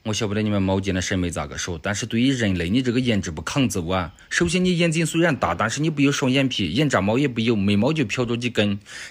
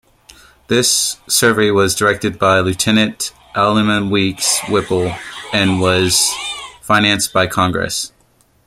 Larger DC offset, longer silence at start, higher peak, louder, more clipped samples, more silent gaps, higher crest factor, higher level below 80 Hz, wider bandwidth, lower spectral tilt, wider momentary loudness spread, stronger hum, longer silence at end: neither; second, 0.05 s vs 0.7 s; second, -6 dBFS vs 0 dBFS; second, -22 LUFS vs -14 LUFS; neither; neither; about the same, 16 dB vs 16 dB; about the same, -46 dBFS vs -48 dBFS; about the same, 16 kHz vs 16.5 kHz; first, -5 dB/octave vs -3 dB/octave; second, 6 LU vs 9 LU; neither; second, 0 s vs 0.6 s